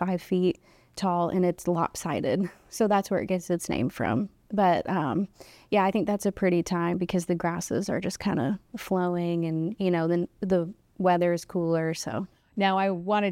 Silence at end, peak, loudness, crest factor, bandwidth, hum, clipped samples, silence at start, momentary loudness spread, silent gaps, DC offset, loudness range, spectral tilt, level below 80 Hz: 0 s; -10 dBFS; -27 LUFS; 16 dB; 16 kHz; none; under 0.1%; 0 s; 7 LU; none; under 0.1%; 1 LU; -6 dB/octave; -58 dBFS